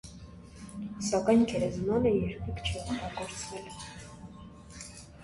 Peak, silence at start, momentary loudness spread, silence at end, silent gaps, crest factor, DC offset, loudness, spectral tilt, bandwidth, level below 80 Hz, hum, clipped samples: -12 dBFS; 0.05 s; 23 LU; 0 s; none; 20 dB; under 0.1%; -31 LUFS; -5.5 dB/octave; 11.5 kHz; -48 dBFS; none; under 0.1%